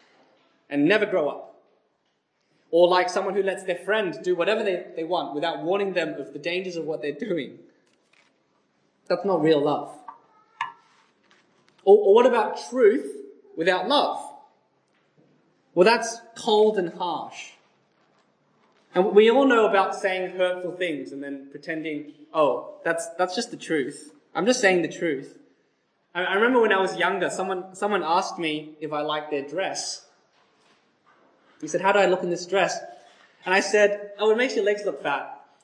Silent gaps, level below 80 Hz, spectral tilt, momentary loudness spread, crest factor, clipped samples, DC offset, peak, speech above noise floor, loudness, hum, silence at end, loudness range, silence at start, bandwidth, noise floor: none; -86 dBFS; -4 dB/octave; 15 LU; 20 dB; under 0.1%; under 0.1%; -4 dBFS; 49 dB; -23 LUFS; none; 0.25 s; 6 LU; 0.7 s; 10.5 kHz; -72 dBFS